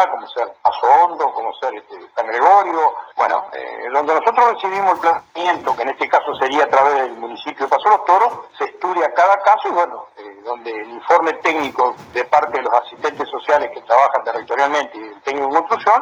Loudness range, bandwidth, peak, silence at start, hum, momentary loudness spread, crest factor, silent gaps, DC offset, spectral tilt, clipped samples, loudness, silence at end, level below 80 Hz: 2 LU; 8 kHz; 0 dBFS; 0 s; none; 13 LU; 16 dB; none; under 0.1%; -3 dB/octave; under 0.1%; -17 LUFS; 0 s; -66 dBFS